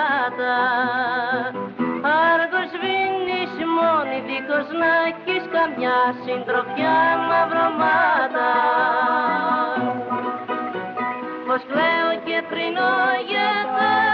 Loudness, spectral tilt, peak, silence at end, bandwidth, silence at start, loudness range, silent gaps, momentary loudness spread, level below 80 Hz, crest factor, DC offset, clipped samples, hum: -20 LUFS; -1 dB/octave; -8 dBFS; 0 s; 6 kHz; 0 s; 4 LU; none; 8 LU; -68 dBFS; 12 dB; under 0.1%; under 0.1%; none